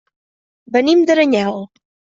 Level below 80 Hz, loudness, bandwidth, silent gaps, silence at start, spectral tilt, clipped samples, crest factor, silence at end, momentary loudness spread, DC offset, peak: -62 dBFS; -14 LUFS; 7.6 kHz; none; 0.7 s; -5 dB/octave; under 0.1%; 14 dB; 0.5 s; 10 LU; under 0.1%; -2 dBFS